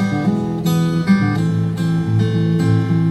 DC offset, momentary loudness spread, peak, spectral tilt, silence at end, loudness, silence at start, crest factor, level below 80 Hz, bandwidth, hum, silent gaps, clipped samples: under 0.1%; 3 LU; -4 dBFS; -7.5 dB/octave; 0 s; -17 LUFS; 0 s; 12 dB; -46 dBFS; 12 kHz; none; none; under 0.1%